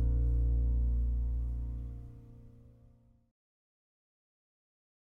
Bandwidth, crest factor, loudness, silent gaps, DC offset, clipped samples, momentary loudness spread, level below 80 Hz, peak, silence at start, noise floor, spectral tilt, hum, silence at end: 1.2 kHz; 14 dB; -34 LUFS; none; under 0.1%; under 0.1%; 20 LU; -34 dBFS; -20 dBFS; 0 s; -62 dBFS; -11.5 dB/octave; none; 2.35 s